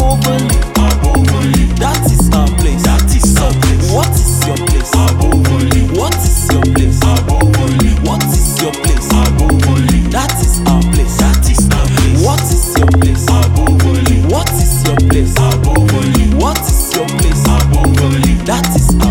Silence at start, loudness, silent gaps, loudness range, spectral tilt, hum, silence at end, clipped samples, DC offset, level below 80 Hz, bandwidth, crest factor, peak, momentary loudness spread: 0 s; -11 LUFS; none; 1 LU; -5 dB/octave; none; 0 s; under 0.1%; under 0.1%; -14 dBFS; 17.5 kHz; 10 dB; 0 dBFS; 2 LU